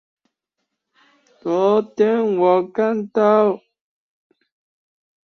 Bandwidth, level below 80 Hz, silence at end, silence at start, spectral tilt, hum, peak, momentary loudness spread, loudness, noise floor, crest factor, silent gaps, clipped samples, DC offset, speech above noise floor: 6.4 kHz; -68 dBFS; 1.7 s; 1.45 s; -7.5 dB/octave; none; -4 dBFS; 7 LU; -18 LUFS; -78 dBFS; 18 dB; none; under 0.1%; under 0.1%; 61 dB